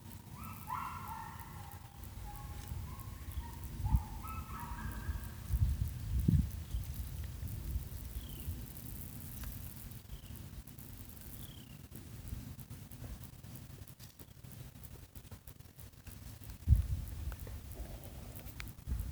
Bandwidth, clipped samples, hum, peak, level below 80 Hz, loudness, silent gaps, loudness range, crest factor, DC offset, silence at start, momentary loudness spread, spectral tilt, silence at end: over 20 kHz; under 0.1%; none; -14 dBFS; -44 dBFS; -43 LUFS; none; 12 LU; 28 dB; under 0.1%; 0 s; 16 LU; -6 dB/octave; 0 s